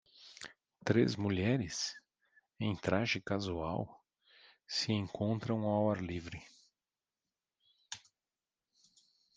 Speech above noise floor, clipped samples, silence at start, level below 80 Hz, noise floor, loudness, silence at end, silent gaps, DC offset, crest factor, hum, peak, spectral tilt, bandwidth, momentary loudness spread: over 55 dB; under 0.1%; 0.2 s; -68 dBFS; under -90 dBFS; -35 LUFS; 1.4 s; none; under 0.1%; 24 dB; none; -14 dBFS; -5.5 dB/octave; 9.8 kHz; 18 LU